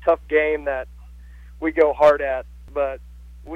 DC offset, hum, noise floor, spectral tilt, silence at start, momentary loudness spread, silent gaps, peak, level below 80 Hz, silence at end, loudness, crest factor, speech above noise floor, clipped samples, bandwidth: under 0.1%; none; -41 dBFS; -6.5 dB/octave; 0 s; 15 LU; none; -6 dBFS; -42 dBFS; 0 s; -21 LUFS; 16 dB; 22 dB; under 0.1%; 8.2 kHz